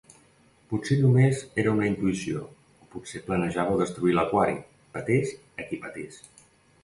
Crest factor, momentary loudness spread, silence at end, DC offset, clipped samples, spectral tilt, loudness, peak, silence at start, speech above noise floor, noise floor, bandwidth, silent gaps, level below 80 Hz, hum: 18 dB; 18 LU; 0.7 s; under 0.1%; under 0.1%; -7 dB/octave; -26 LUFS; -10 dBFS; 0.7 s; 34 dB; -60 dBFS; 11.5 kHz; none; -56 dBFS; none